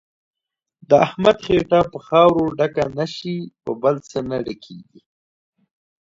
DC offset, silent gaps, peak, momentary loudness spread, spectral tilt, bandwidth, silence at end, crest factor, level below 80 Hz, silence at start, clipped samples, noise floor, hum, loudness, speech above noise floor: under 0.1%; none; 0 dBFS; 14 LU; -6.5 dB/octave; 7.8 kHz; 1.3 s; 20 dB; -50 dBFS; 0.9 s; under 0.1%; -85 dBFS; none; -19 LUFS; 66 dB